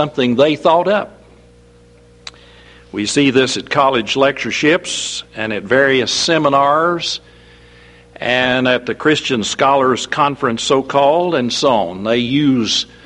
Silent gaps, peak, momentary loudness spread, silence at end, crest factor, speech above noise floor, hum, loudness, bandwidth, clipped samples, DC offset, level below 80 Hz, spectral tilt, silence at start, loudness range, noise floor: none; 0 dBFS; 10 LU; 0.2 s; 16 dB; 31 dB; 60 Hz at -50 dBFS; -15 LUFS; 11 kHz; under 0.1%; under 0.1%; -50 dBFS; -4 dB/octave; 0 s; 3 LU; -45 dBFS